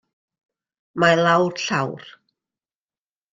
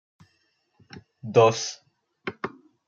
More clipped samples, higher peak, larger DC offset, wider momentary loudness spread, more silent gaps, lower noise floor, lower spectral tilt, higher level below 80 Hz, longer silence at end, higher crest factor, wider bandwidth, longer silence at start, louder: neither; first, -2 dBFS vs -6 dBFS; neither; second, 18 LU vs 21 LU; neither; first, under -90 dBFS vs -70 dBFS; about the same, -5 dB/octave vs -4.5 dB/octave; first, -64 dBFS vs -70 dBFS; first, 1.25 s vs 0.4 s; about the same, 20 dB vs 22 dB; first, 9 kHz vs 7.6 kHz; about the same, 0.95 s vs 0.95 s; first, -19 LUFS vs -23 LUFS